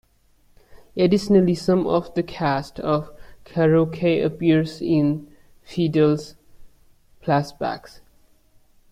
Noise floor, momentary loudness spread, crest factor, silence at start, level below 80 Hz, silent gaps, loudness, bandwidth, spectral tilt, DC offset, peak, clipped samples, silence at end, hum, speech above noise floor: -58 dBFS; 13 LU; 18 dB; 0.75 s; -52 dBFS; none; -21 LUFS; 13.5 kHz; -7.5 dB/octave; under 0.1%; -4 dBFS; under 0.1%; 1.15 s; none; 38 dB